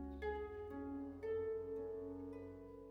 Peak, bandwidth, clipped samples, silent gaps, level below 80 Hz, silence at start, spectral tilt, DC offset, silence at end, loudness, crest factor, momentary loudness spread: -34 dBFS; 5.4 kHz; under 0.1%; none; -60 dBFS; 0 s; -8.5 dB/octave; under 0.1%; 0 s; -47 LUFS; 14 dB; 9 LU